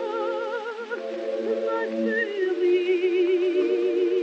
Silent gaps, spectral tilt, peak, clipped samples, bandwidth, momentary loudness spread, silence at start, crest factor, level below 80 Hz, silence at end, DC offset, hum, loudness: none; -5.5 dB/octave; -12 dBFS; under 0.1%; 7.2 kHz; 9 LU; 0 s; 12 dB; -88 dBFS; 0 s; under 0.1%; none; -25 LUFS